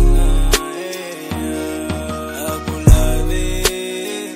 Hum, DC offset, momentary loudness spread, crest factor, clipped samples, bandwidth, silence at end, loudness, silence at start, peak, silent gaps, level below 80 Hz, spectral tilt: none; under 0.1%; 11 LU; 16 dB; 0.1%; 16 kHz; 0 s; -19 LUFS; 0 s; 0 dBFS; none; -18 dBFS; -4.5 dB/octave